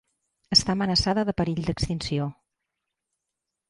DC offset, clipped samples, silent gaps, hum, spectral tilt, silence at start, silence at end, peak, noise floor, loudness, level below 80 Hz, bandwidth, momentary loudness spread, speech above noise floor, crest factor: under 0.1%; under 0.1%; none; none; -4.5 dB/octave; 0.5 s; 1.35 s; -6 dBFS; -84 dBFS; -24 LUFS; -44 dBFS; 11.5 kHz; 9 LU; 60 dB; 22 dB